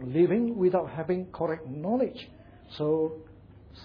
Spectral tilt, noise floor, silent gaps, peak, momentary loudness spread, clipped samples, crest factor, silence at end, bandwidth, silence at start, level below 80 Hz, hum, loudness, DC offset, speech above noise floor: -10 dB/octave; -50 dBFS; none; -12 dBFS; 20 LU; under 0.1%; 16 dB; 0 s; 5.2 kHz; 0 s; -58 dBFS; none; -28 LUFS; under 0.1%; 23 dB